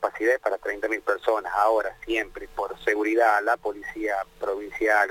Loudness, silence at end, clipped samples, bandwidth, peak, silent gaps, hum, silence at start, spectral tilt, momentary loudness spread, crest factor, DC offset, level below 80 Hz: -25 LUFS; 0 s; under 0.1%; 17 kHz; -8 dBFS; none; none; 0 s; -3.5 dB/octave; 10 LU; 16 dB; under 0.1%; -54 dBFS